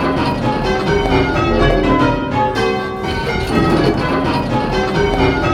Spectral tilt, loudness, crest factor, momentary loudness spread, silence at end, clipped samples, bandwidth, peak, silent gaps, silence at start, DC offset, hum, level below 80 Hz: -6.5 dB/octave; -16 LUFS; 14 dB; 4 LU; 0 s; under 0.1%; 14.5 kHz; 0 dBFS; none; 0 s; under 0.1%; none; -26 dBFS